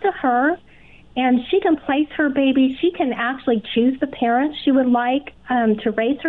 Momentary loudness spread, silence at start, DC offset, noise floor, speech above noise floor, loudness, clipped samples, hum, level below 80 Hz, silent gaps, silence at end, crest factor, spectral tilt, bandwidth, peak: 5 LU; 0 s; 0.2%; -48 dBFS; 29 dB; -19 LUFS; under 0.1%; none; -54 dBFS; none; 0 s; 12 dB; -8 dB/octave; 4.2 kHz; -8 dBFS